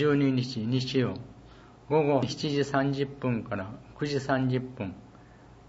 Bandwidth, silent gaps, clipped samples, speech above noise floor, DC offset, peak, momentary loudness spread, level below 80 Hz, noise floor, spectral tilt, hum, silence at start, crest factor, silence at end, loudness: 8 kHz; none; under 0.1%; 24 dB; under 0.1%; -10 dBFS; 13 LU; -58 dBFS; -52 dBFS; -6.5 dB/octave; none; 0 s; 18 dB; 0 s; -29 LUFS